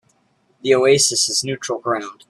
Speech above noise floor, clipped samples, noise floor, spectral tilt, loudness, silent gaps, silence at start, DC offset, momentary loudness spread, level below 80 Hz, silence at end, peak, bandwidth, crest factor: 44 dB; under 0.1%; -62 dBFS; -2.5 dB/octave; -17 LUFS; none; 0.65 s; under 0.1%; 11 LU; -64 dBFS; 0.15 s; -2 dBFS; 13.5 kHz; 18 dB